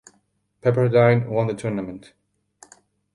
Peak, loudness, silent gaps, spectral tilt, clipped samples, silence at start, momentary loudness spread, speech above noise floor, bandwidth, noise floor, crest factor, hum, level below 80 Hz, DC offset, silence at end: -4 dBFS; -20 LUFS; none; -8 dB/octave; under 0.1%; 0.65 s; 15 LU; 47 dB; 11.5 kHz; -67 dBFS; 18 dB; none; -58 dBFS; under 0.1%; 1.15 s